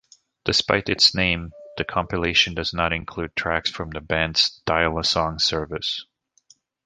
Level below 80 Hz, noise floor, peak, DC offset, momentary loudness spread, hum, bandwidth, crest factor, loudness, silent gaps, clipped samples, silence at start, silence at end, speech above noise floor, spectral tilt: -42 dBFS; -59 dBFS; -2 dBFS; under 0.1%; 11 LU; none; 10 kHz; 22 dB; -21 LUFS; none; under 0.1%; 0.45 s; 0.85 s; 36 dB; -3 dB/octave